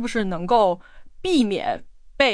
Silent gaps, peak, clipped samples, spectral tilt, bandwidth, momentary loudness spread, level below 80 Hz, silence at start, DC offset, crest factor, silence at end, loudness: none; -4 dBFS; under 0.1%; -5 dB/octave; 10.5 kHz; 12 LU; -44 dBFS; 0 s; under 0.1%; 18 dB; 0 s; -22 LUFS